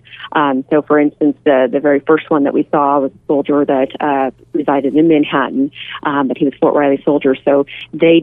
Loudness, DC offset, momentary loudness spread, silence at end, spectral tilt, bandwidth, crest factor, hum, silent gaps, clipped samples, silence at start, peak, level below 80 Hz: -14 LUFS; under 0.1%; 6 LU; 0 s; -9 dB/octave; 3.8 kHz; 14 dB; none; none; under 0.1%; 0.1 s; 0 dBFS; -56 dBFS